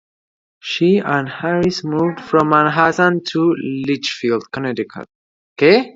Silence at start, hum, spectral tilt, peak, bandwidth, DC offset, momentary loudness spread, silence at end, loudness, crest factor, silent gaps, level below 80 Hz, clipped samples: 0.65 s; none; -6 dB/octave; 0 dBFS; 7.8 kHz; under 0.1%; 11 LU; 0.05 s; -17 LUFS; 16 dB; 5.15-5.56 s; -56 dBFS; under 0.1%